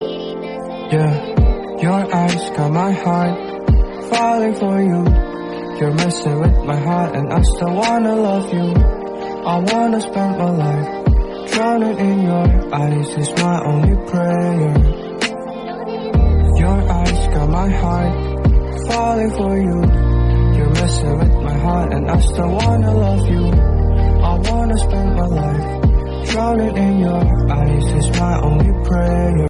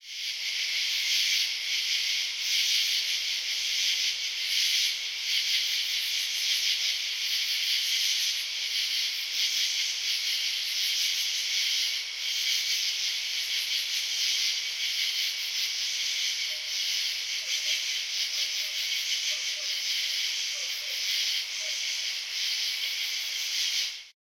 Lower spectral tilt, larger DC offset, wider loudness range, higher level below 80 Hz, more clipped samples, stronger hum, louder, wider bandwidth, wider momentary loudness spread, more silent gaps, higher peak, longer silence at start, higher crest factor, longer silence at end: first, -7 dB/octave vs 6 dB/octave; neither; about the same, 2 LU vs 2 LU; first, -20 dBFS vs -76 dBFS; neither; neither; first, -16 LUFS vs -26 LUFS; second, 11.5 kHz vs 16.5 kHz; about the same, 5 LU vs 4 LU; neither; first, -2 dBFS vs -12 dBFS; about the same, 0 s vs 0 s; second, 12 dB vs 18 dB; second, 0 s vs 0.15 s